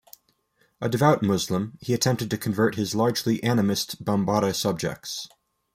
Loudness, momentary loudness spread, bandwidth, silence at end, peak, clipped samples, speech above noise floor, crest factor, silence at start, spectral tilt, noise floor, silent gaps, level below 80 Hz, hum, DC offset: -24 LUFS; 9 LU; 16 kHz; 0.5 s; -6 dBFS; under 0.1%; 43 dB; 20 dB; 0.8 s; -5 dB/octave; -67 dBFS; none; -60 dBFS; none; under 0.1%